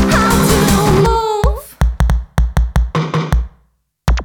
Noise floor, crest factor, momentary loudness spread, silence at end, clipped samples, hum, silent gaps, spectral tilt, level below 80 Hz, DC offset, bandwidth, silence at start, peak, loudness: -58 dBFS; 14 dB; 8 LU; 0 s; under 0.1%; none; none; -5.5 dB/octave; -18 dBFS; under 0.1%; 19.5 kHz; 0 s; 0 dBFS; -15 LUFS